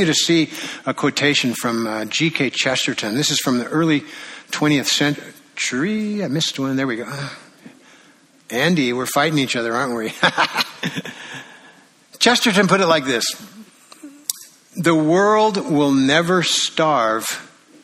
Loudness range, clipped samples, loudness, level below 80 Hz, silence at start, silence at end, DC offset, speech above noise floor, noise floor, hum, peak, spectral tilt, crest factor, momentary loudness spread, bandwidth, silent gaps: 5 LU; under 0.1%; -18 LUFS; -62 dBFS; 0 s; 0.35 s; under 0.1%; 33 dB; -51 dBFS; none; 0 dBFS; -3.5 dB/octave; 20 dB; 14 LU; 15.5 kHz; none